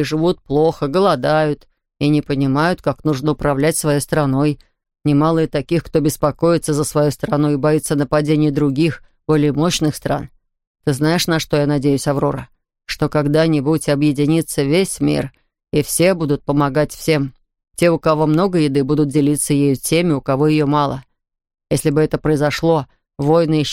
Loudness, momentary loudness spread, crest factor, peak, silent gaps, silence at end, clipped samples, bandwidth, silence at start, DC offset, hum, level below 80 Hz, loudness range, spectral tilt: -17 LUFS; 7 LU; 14 dB; -2 dBFS; 10.67-10.75 s; 0 s; under 0.1%; 16.5 kHz; 0 s; under 0.1%; none; -42 dBFS; 2 LU; -6 dB/octave